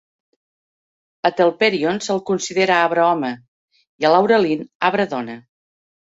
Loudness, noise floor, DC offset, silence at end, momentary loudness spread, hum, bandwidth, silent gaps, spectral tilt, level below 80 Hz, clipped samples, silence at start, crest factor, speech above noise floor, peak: -18 LUFS; under -90 dBFS; under 0.1%; 0.75 s; 12 LU; none; 8 kHz; 3.48-3.68 s, 3.89-3.99 s, 4.75-4.80 s; -4.5 dB/octave; -66 dBFS; under 0.1%; 1.25 s; 18 dB; over 72 dB; -2 dBFS